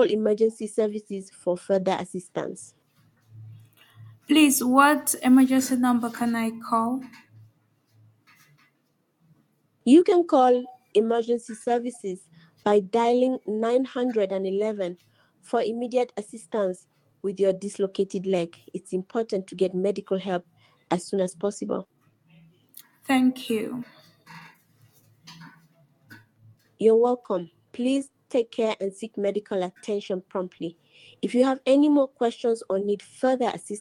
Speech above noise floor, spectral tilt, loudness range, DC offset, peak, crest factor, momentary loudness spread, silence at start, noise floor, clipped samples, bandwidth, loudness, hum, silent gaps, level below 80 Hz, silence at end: 47 dB; -5 dB/octave; 8 LU; under 0.1%; -4 dBFS; 22 dB; 14 LU; 0 s; -70 dBFS; under 0.1%; 17.5 kHz; -24 LUFS; none; none; -74 dBFS; 0 s